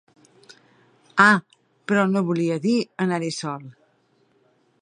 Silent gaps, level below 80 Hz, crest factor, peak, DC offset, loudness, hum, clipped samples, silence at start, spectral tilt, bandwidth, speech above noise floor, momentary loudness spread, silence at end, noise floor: none; -74 dBFS; 22 dB; -2 dBFS; under 0.1%; -21 LUFS; none; under 0.1%; 1.15 s; -5.5 dB/octave; 10.5 kHz; 43 dB; 15 LU; 1.1 s; -64 dBFS